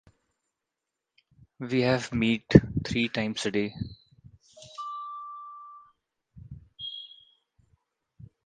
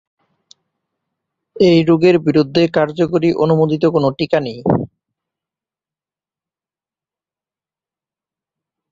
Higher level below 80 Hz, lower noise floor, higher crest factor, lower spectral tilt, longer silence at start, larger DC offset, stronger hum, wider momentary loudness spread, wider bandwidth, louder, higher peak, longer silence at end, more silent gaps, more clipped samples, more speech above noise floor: first, -48 dBFS vs -54 dBFS; second, -86 dBFS vs under -90 dBFS; first, 30 dB vs 16 dB; second, -6 dB/octave vs -8 dB/octave; about the same, 1.6 s vs 1.55 s; neither; neither; first, 26 LU vs 6 LU; first, 9.6 kHz vs 7.6 kHz; second, -27 LUFS vs -14 LUFS; about the same, 0 dBFS vs -2 dBFS; second, 0.2 s vs 4.05 s; neither; neither; second, 61 dB vs over 77 dB